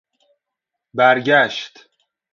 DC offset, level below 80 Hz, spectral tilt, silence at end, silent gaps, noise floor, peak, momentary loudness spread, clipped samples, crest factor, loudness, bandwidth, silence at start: under 0.1%; -68 dBFS; -4.5 dB/octave; 0.65 s; none; -82 dBFS; 0 dBFS; 17 LU; under 0.1%; 20 dB; -15 LUFS; 7.2 kHz; 0.95 s